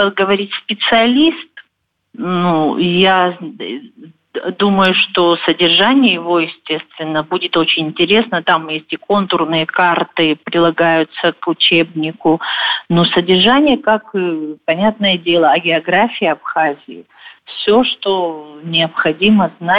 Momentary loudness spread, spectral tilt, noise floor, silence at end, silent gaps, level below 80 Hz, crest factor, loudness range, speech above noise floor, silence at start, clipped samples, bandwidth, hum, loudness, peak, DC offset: 10 LU; -7.5 dB/octave; -67 dBFS; 0 s; none; -52 dBFS; 12 dB; 3 LU; 53 dB; 0 s; under 0.1%; 5.6 kHz; none; -13 LUFS; -2 dBFS; under 0.1%